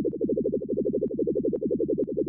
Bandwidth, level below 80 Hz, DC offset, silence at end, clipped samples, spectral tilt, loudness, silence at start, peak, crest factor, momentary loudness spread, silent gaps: 1.1 kHz; -54 dBFS; under 0.1%; 0 s; under 0.1%; -15.5 dB/octave; -28 LUFS; 0 s; -16 dBFS; 10 dB; 1 LU; none